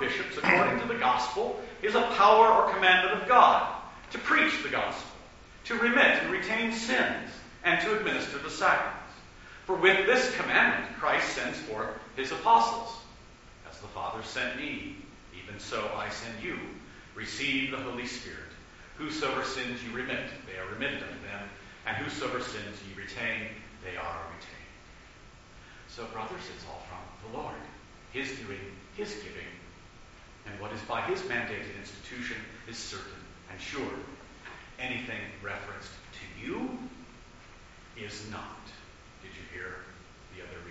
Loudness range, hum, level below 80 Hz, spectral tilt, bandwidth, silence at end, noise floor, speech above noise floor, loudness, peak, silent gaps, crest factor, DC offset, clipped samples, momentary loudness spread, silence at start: 18 LU; none; -56 dBFS; -1.5 dB/octave; 8 kHz; 0 s; -52 dBFS; 23 dB; -28 LUFS; -6 dBFS; none; 26 dB; under 0.1%; under 0.1%; 23 LU; 0 s